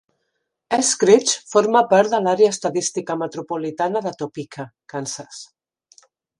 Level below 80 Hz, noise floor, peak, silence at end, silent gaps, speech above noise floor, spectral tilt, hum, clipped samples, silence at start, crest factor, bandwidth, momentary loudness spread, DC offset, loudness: -72 dBFS; -75 dBFS; 0 dBFS; 0.95 s; none; 56 dB; -3.5 dB/octave; none; under 0.1%; 0.7 s; 20 dB; 11.5 kHz; 17 LU; under 0.1%; -19 LUFS